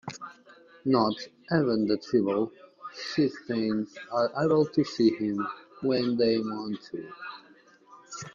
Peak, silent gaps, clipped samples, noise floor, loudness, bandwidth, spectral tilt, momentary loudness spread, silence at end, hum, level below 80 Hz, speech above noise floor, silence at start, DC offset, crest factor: -10 dBFS; none; under 0.1%; -57 dBFS; -28 LUFS; 7.4 kHz; -6.5 dB/octave; 17 LU; 0.05 s; none; -68 dBFS; 30 dB; 0.05 s; under 0.1%; 18 dB